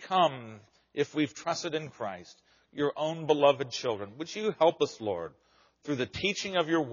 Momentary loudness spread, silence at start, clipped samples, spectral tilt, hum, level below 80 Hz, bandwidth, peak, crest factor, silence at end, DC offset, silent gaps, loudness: 15 LU; 0 s; under 0.1%; -3 dB/octave; none; -68 dBFS; 7.2 kHz; -10 dBFS; 20 dB; 0 s; under 0.1%; none; -30 LUFS